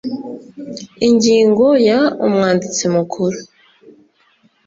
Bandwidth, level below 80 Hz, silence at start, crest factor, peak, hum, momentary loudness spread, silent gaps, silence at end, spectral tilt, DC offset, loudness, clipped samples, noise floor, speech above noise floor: 7.8 kHz; -56 dBFS; 0.05 s; 14 dB; -2 dBFS; none; 19 LU; none; 1.2 s; -5 dB/octave; under 0.1%; -14 LUFS; under 0.1%; -56 dBFS; 42 dB